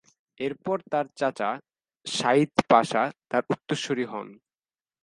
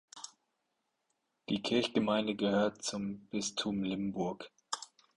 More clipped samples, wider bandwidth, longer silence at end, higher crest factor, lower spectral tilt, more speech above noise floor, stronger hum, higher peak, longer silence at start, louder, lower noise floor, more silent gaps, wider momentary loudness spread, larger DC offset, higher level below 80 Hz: neither; about the same, 11.5 kHz vs 11.5 kHz; first, 0.7 s vs 0.3 s; first, 24 dB vs 18 dB; about the same, -4.5 dB/octave vs -4.5 dB/octave; first, over 64 dB vs 49 dB; neither; first, -2 dBFS vs -18 dBFS; first, 0.4 s vs 0.15 s; first, -26 LUFS vs -35 LUFS; first, under -90 dBFS vs -83 dBFS; neither; second, 13 LU vs 17 LU; neither; about the same, -70 dBFS vs -70 dBFS